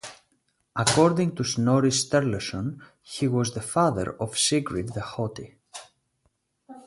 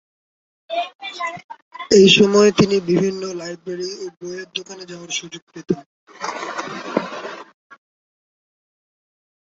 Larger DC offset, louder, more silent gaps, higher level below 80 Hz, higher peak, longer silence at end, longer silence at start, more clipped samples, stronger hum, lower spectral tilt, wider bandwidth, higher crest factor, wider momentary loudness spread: neither; second, -25 LUFS vs -19 LUFS; second, none vs 0.95-0.99 s, 1.44-1.49 s, 1.62-1.71 s, 5.42-5.47 s, 5.86-6.07 s; about the same, -54 dBFS vs -56 dBFS; second, -6 dBFS vs 0 dBFS; second, 0.05 s vs 2.05 s; second, 0.05 s vs 0.7 s; neither; neither; about the same, -4.5 dB/octave vs -4.5 dB/octave; first, 11.5 kHz vs 7.8 kHz; about the same, 20 dB vs 20 dB; about the same, 21 LU vs 23 LU